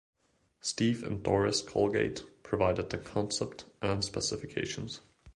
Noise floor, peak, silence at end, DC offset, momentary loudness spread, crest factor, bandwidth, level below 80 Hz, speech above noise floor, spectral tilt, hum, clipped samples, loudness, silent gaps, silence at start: -68 dBFS; -12 dBFS; 0.05 s; under 0.1%; 10 LU; 20 dB; 11.5 kHz; -54 dBFS; 36 dB; -4.5 dB/octave; none; under 0.1%; -32 LUFS; none; 0.65 s